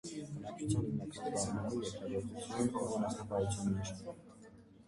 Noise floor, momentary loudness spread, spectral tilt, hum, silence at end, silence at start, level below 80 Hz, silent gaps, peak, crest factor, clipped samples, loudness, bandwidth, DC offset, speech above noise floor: -58 dBFS; 13 LU; -5.5 dB/octave; none; 0.05 s; 0.05 s; -58 dBFS; none; -22 dBFS; 16 dB; under 0.1%; -39 LUFS; 11.5 kHz; under 0.1%; 20 dB